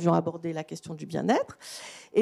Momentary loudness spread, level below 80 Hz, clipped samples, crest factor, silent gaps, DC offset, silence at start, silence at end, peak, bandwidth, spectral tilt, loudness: 14 LU; -74 dBFS; under 0.1%; 18 dB; none; under 0.1%; 0 s; 0 s; -10 dBFS; 12.5 kHz; -6.5 dB/octave; -30 LUFS